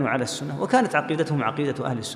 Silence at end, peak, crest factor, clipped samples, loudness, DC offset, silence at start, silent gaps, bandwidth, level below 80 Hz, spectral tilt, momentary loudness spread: 0 s; -6 dBFS; 18 dB; under 0.1%; -24 LUFS; under 0.1%; 0 s; none; 15 kHz; -66 dBFS; -5.5 dB/octave; 7 LU